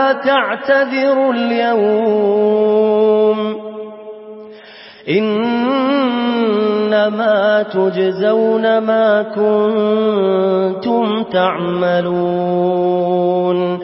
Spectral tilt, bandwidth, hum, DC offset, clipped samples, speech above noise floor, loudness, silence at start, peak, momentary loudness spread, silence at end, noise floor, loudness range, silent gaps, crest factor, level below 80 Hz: -11 dB/octave; 5.8 kHz; none; under 0.1%; under 0.1%; 24 dB; -15 LUFS; 0 s; -2 dBFS; 4 LU; 0 s; -38 dBFS; 3 LU; none; 12 dB; -66 dBFS